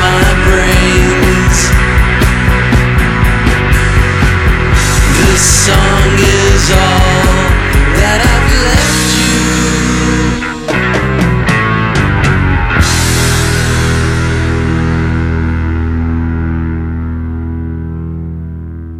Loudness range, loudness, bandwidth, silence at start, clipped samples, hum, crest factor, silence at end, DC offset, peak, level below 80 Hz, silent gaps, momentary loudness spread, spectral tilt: 6 LU; -10 LUFS; 16 kHz; 0 s; under 0.1%; none; 10 dB; 0 s; under 0.1%; 0 dBFS; -14 dBFS; none; 9 LU; -4.5 dB/octave